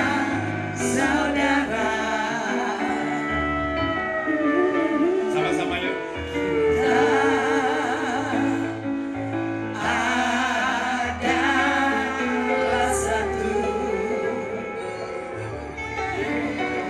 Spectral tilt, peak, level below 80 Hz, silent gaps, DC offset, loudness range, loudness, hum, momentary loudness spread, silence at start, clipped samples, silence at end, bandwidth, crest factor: -4.5 dB/octave; -8 dBFS; -46 dBFS; none; under 0.1%; 3 LU; -23 LUFS; none; 8 LU; 0 s; under 0.1%; 0 s; 13 kHz; 16 dB